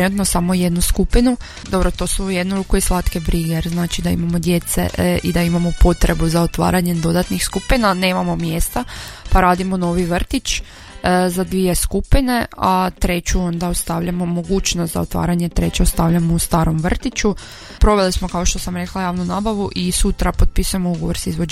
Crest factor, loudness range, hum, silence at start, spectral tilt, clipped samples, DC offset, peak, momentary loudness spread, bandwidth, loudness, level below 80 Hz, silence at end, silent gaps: 16 dB; 2 LU; none; 0 s; -5 dB/octave; under 0.1%; under 0.1%; -2 dBFS; 5 LU; 15.5 kHz; -18 LUFS; -22 dBFS; 0 s; none